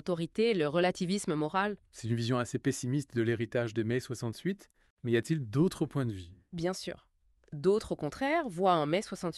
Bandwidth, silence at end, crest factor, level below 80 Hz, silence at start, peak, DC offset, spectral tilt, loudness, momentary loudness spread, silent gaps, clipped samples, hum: 13 kHz; 0 s; 18 dB; -62 dBFS; 0.05 s; -14 dBFS; under 0.1%; -6 dB/octave; -32 LUFS; 10 LU; 4.90-4.97 s; under 0.1%; none